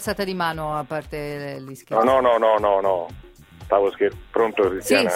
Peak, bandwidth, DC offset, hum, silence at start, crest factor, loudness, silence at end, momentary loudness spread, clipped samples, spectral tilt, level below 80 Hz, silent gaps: -4 dBFS; 16.5 kHz; under 0.1%; none; 0 s; 18 dB; -21 LUFS; 0 s; 13 LU; under 0.1%; -4.5 dB/octave; -48 dBFS; none